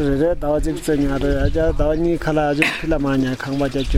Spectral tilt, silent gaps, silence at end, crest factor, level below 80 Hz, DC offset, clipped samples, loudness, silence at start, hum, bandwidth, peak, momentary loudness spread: -6.5 dB/octave; none; 0 s; 18 dB; -26 dBFS; under 0.1%; under 0.1%; -19 LUFS; 0 s; none; 16 kHz; 0 dBFS; 3 LU